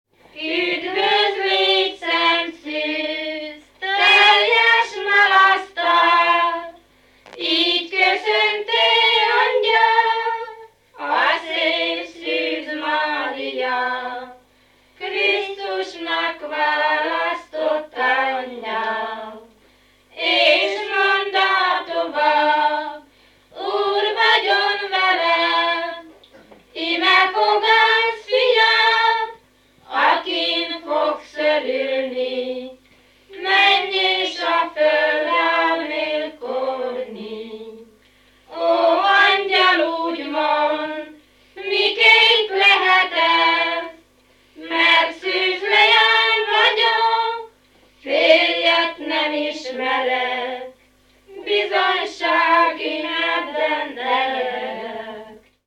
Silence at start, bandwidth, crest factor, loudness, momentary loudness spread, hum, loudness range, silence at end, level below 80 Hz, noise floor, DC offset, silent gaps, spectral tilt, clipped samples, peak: 0.35 s; 13 kHz; 20 dB; -17 LUFS; 14 LU; none; 7 LU; 0.3 s; -66 dBFS; -56 dBFS; under 0.1%; none; -1.5 dB/octave; under 0.1%; 0 dBFS